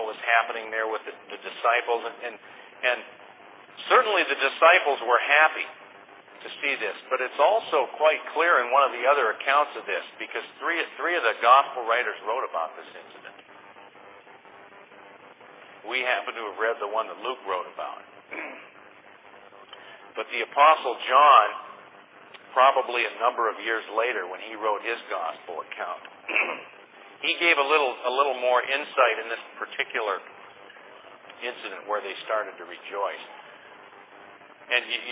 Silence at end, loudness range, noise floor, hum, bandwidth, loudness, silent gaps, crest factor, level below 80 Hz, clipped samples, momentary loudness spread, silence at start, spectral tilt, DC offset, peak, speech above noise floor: 0 s; 12 LU; -51 dBFS; none; 4 kHz; -24 LUFS; none; 24 dB; under -90 dBFS; under 0.1%; 19 LU; 0 s; -4.5 dB/octave; under 0.1%; -4 dBFS; 26 dB